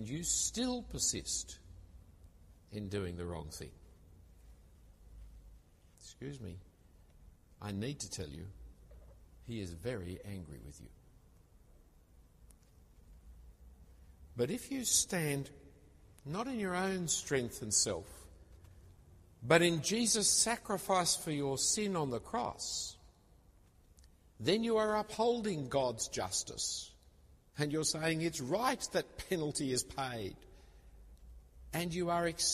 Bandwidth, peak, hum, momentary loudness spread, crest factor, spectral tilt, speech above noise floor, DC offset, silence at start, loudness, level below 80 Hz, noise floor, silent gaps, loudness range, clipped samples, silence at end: 15 kHz; -12 dBFS; none; 19 LU; 26 dB; -3 dB/octave; 28 dB; under 0.1%; 0 s; -35 LUFS; -58 dBFS; -64 dBFS; none; 16 LU; under 0.1%; 0 s